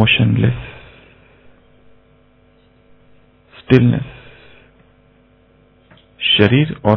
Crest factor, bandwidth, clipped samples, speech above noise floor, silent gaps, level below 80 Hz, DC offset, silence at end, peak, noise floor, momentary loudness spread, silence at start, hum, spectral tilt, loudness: 18 dB; 6 kHz; 0.1%; 39 dB; none; -44 dBFS; under 0.1%; 0 s; 0 dBFS; -52 dBFS; 21 LU; 0 s; none; -8.5 dB/octave; -14 LUFS